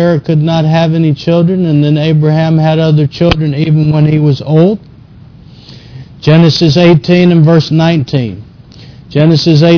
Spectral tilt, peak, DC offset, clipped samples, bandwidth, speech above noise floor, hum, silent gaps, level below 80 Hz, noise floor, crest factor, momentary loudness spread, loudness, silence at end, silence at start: -8 dB/octave; 0 dBFS; under 0.1%; 0.2%; 5.4 kHz; 27 dB; none; none; -36 dBFS; -35 dBFS; 8 dB; 5 LU; -9 LUFS; 0 s; 0 s